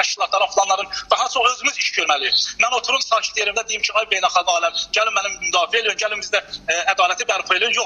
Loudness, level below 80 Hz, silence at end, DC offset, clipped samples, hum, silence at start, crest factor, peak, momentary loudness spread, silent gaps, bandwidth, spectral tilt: -18 LUFS; -58 dBFS; 0 s; under 0.1%; under 0.1%; none; 0 s; 18 dB; 0 dBFS; 4 LU; none; 11.5 kHz; 1.5 dB/octave